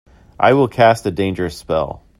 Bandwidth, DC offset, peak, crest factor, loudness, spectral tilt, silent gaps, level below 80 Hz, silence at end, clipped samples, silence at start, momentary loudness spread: 15.5 kHz; under 0.1%; 0 dBFS; 16 dB; -16 LUFS; -6.5 dB/octave; none; -44 dBFS; 0.25 s; under 0.1%; 0.4 s; 8 LU